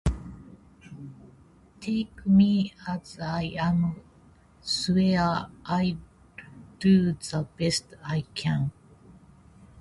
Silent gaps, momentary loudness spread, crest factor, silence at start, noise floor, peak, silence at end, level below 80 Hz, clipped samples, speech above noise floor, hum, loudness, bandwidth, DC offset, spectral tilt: none; 23 LU; 18 dB; 0.05 s; -56 dBFS; -10 dBFS; 0 s; -46 dBFS; under 0.1%; 31 dB; none; -26 LUFS; 11.5 kHz; under 0.1%; -6 dB/octave